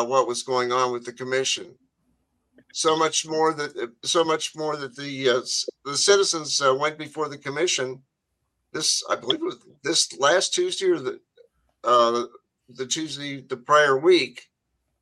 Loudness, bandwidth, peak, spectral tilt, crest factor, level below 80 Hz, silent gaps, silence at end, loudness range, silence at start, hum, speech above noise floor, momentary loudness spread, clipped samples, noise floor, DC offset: -23 LUFS; 12.5 kHz; -4 dBFS; -2 dB/octave; 20 dB; -76 dBFS; none; 0.6 s; 3 LU; 0 s; none; 54 dB; 13 LU; under 0.1%; -77 dBFS; under 0.1%